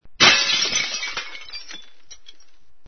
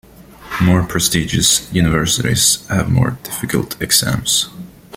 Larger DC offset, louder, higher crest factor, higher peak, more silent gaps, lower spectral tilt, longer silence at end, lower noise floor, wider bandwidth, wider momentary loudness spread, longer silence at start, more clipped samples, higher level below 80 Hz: first, 1% vs under 0.1%; about the same, -17 LUFS vs -15 LUFS; first, 22 dB vs 16 dB; about the same, 0 dBFS vs 0 dBFS; neither; second, 0 dB/octave vs -3.5 dB/octave; first, 0.75 s vs 0 s; first, -57 dBFS vs -36 dBFS; second, 6.6 kHz vs 16.5 kHz; first, 23 LU vs 8 LU; second, 0 s vs 0.2 s; neither; second, -54 dBFS vs -36 dBFS